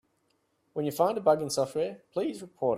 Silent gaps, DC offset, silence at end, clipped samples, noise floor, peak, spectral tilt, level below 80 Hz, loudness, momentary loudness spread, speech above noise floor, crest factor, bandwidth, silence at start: none; under 0.1%; 0 s; under 0.1%; -73 dBFS; -10 dBFS; -5 dB/octave; -72 dBFS; -29 LUFS; 9 LU; 45 dB; 20 dB; 15.5 kHz; 0.75 s